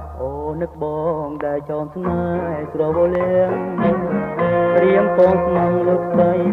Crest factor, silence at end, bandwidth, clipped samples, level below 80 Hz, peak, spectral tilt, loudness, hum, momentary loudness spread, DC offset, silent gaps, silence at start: 16 dB; 0 s; 4.1 kHz; under 0.1%; -42 dBFS; -2 dBFS; -10 dB/octave; -18 LUFS; none; 10 LU; under 0.1%; none; 0 s